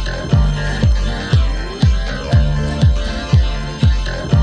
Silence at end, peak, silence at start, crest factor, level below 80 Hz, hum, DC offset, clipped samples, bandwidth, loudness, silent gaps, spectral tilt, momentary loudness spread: 0 s; -2 dBFS; 0 s; 14 dB; -18 dBFS; none; under 0.1%; under 0.1%; 10 kHz; -17 LUFS; none; -6.5 dB/octave; 5 LU